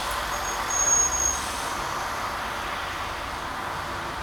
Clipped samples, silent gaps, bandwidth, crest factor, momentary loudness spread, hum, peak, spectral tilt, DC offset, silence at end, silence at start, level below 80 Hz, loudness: under 0.1%; none; over 20 kHz; 18 dB; 12 LU; none; -10 dBFS; -1 dB/octave; under 0.1%; 0 s; 0 s; -44 dBFS; -25 LUFS